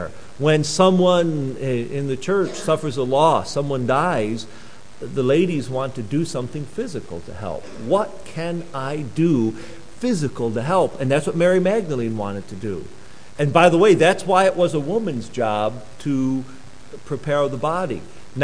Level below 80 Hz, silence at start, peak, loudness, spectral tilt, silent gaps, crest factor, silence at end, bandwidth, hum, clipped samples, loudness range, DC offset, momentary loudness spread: -52 dBFS; 0 s; 0 dBFS; -20 LUFS; -6 dB/octave; none; 20 dB; 0 s; 10.5 kHz; none; under 0.1%; 6 LU; 2%; 15 LU